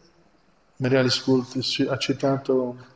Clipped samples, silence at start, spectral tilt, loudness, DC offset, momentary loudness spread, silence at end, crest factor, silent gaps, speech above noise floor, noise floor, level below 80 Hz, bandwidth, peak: under 0.1%; 0.8 s; -5.5 dB/octave; -23 LUFS; under 0.1%; 5 LU; 0.1 s; 18 dB; none; 38 dB; -62 dBFS; -64 dBFS; 8 kHz; -6 dBFS